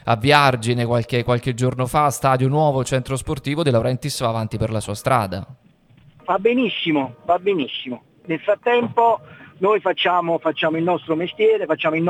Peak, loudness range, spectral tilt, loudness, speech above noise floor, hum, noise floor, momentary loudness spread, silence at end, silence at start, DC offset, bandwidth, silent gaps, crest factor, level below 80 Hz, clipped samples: 0 dBFS; 3 LU; -5.5 dB/octave; -20 LUFS; 32 dB; none; -51 dBFS; 7 LU; 0 s; 0.05 s; under 0.1%; 16 kHz; none; 20 dB; -48 dBFS; under 0.1%